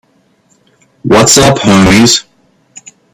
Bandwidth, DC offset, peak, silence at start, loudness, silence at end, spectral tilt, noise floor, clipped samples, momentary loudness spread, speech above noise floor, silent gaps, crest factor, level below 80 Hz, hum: over 20 kHz; under 0.1%; 0 dBFS; 1.05 s; -6 LUFS; 0.95 s; -3.5 dB/octave; -51 dBFS; 0.5%; 7 LU; 46 dB; none; 10 dB; -34 dBFS; none